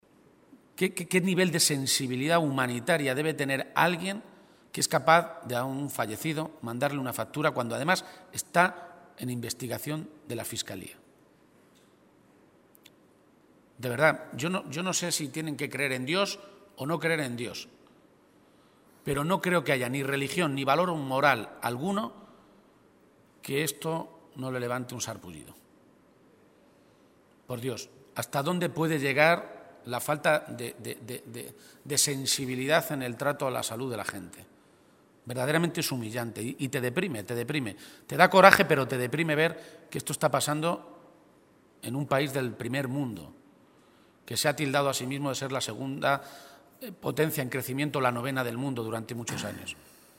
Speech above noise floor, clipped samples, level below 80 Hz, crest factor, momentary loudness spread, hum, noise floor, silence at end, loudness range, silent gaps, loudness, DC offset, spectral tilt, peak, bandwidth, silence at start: 32 dB; under 0.1%; -68 dBFS; 30 dB; 15 LU; none; -61 dBFS; 0.45 s; 11 LU; none; -28 LUFS; under 0.1%; -4 dB/octave; 0 dBFS; 16 kHz; 0.5 s